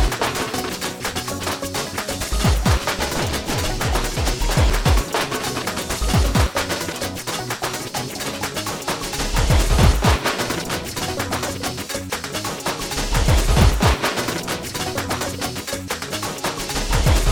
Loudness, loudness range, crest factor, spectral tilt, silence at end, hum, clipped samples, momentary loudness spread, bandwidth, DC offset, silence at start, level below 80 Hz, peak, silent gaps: -21 LUFS; 2 LU; 20 dB; -4 dB/octave; 0 s; none; under 0.1%; 8 LU; over 20 kHz; under 0.1%; 0 s; -24 dBFS; 0 dBFS; none